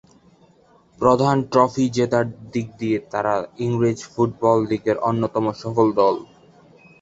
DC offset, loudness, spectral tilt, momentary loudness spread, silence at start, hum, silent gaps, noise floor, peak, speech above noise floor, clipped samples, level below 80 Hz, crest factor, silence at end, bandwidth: under 0.1%; -21 LUFS; -7 dB/octave; 7 LU; 1 s; none; none; -55 dBFS; -2 dBFS; 35 dB; under 0.1%; -56 dBFS; 20 dB; 0.75 s; 8 kHz